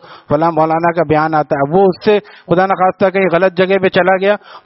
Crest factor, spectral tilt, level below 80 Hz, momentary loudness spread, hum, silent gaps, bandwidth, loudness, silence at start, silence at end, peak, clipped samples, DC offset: 12 dB; -4.5 dB/octave; -50 dBFS; 3 LU; none; none; 5.8 kHz; -13 LUFS; 0.1 s; 0.1 s; 0 dBFS; under 0.1%; under 0.1%